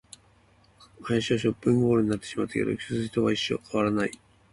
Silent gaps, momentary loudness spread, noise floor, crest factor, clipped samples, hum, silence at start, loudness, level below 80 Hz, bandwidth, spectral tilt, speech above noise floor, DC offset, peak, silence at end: none; 7 LU; -60 dBFS; 16 dB; under 0.1%; none; 1 s; -27 LUFS; -56 dBFS; 11.5 kHz; -6 dB/octave; 34 dB; under 0.1%; -12 dBFS; 0.4 s